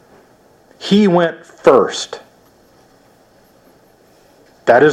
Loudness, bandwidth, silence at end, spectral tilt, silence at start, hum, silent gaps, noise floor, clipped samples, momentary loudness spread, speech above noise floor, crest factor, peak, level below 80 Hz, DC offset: -14 LUFS; 10.5 kHz; 0 s; -5.5 dB/octave; 0.8 s; none; none; -50 dBFS; under 0.1%; 16 LU; 36 dB; 16 dB; 0 dBFS; -58 dBFS; under 0.1%